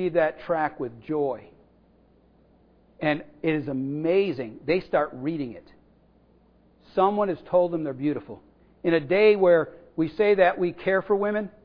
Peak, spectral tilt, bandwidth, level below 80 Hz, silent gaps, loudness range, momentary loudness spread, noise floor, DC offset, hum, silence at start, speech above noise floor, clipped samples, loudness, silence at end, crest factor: -6 dBFS; -9.5 dB/octave; 5.2 kHz; -60 dBFS; none; 7 LU; 13 LU; -59 dBFS; under 0.1%; none; 0 s; 35 dB; under 0.1%; -25 LUFS; 0.15 s; 18 dB